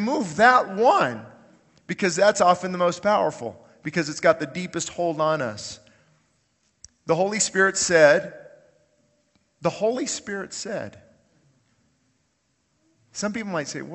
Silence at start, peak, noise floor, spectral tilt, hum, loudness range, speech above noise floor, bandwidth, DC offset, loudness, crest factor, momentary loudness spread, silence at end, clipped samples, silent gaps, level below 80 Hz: 0 s; -2 dBFS; -70 dBFS; -3.5 dB/octave; none; 10 LU; 48 dB; 8.6 kHz; under 0.1%; -22 LUFS; 22 dB; 19 LU; 0 s; under 0.1%; none; -64 dBFS